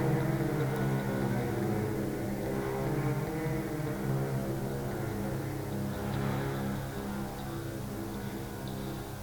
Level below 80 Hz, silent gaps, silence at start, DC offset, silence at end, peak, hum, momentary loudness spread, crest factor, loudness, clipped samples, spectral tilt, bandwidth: -50 dBFS; none; 0 s; under 0.1%; 0 s; -18 dBFS; none; 7 LU; 14 dB; -34 LUFS; under 0.1%; -7 dB/octave; 19 kHz